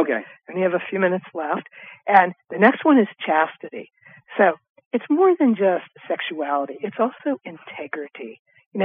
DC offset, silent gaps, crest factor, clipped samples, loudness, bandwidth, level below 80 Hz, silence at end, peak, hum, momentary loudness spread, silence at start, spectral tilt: under 0.1%; 4.70-4.75 s, 4.86-4.91 s, 8.39-8.45 s, 8.66-8.71 s; 20 dB; under 0.1%; -21 LUFS; 4.8 kHz; -84 dBFS; 0 s; -2 dBFS; none; 19 LU; 0 s; -9 dB/octave